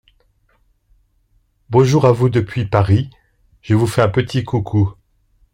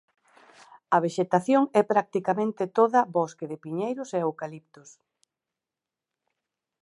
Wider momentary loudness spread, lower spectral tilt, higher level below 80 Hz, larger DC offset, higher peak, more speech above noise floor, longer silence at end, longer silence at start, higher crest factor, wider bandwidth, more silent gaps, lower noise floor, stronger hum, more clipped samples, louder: second, 7 LU vs 12 LU; about the same, -7.5 dB/octave vs -6.5 dB/octave; first, -46 dBFS vs -80 dBFS; neither; first, -2 dBFS vs -6 dBFS; second, 45 dB vs 64 dB; second, 0.6 s vs 2.25 s; first, 1.7 s vs 0.9 s; about the same, 16 dB vs 20 dB; first, 15.5 kHz vs 11.5 kHz; neither; second, -60 dBFS vs -89 dBFS; neither; neither; first, -16 LUFS vs -25 LUFS